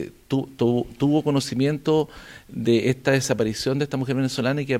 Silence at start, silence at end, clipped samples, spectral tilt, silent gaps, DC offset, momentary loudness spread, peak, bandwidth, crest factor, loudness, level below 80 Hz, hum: 0 s; 0 s; under 0.1%; -6 dB/octave; none; under 0.1%; 7 LU; -6 dBFS; 16 kHz; 16 dB; -23 LUFS; -52 dBFS; none